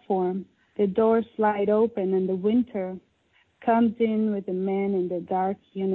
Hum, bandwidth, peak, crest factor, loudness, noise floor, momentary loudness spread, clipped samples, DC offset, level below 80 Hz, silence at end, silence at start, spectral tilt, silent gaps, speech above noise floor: none; 4.1 kHz; -10 dBFS; 14 dB; -25 LUFS; -65 dBFS; 9 LU; under 0.1%; under 0.1%; -64 dBFS; 0 s; 0.1 s; -11 dB/octave; none; 41 dB